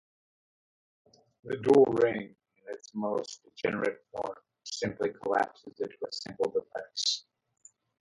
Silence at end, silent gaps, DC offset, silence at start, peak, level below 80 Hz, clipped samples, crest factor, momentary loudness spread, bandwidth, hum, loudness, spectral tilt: 0.8 s; none; under 0.1%; 1.45 s; -10 dBFS; -70 dBFS; under 0.1%; 22 dB; 16 LU; 11 kHz; none; -31 LUFS; -4 dB/octave